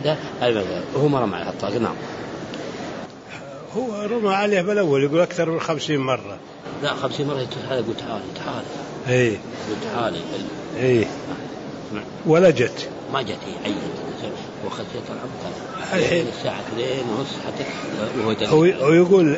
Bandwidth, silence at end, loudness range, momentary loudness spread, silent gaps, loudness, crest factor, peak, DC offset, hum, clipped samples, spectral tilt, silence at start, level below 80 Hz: 8 kHz; 0 s; 5 LU; 15 LU; none; -23 LUFS; 18 dB; -4 dBFS; under 0.1%; none; under 0.1%; -6 dB/octave; 0 s; -56 dBFS